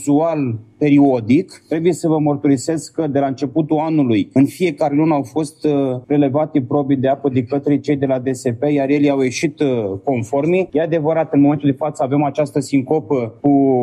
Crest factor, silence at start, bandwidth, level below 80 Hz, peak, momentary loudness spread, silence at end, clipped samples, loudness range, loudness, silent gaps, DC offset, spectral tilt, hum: 12 dB; 0 s; 11.5 kHz; -60 dBFS; -4 dBFS; 6 LU; 0 s; under 0.1%; 1 LU; -17 LUFS; none; under 0.1%; -7 dB/octave; none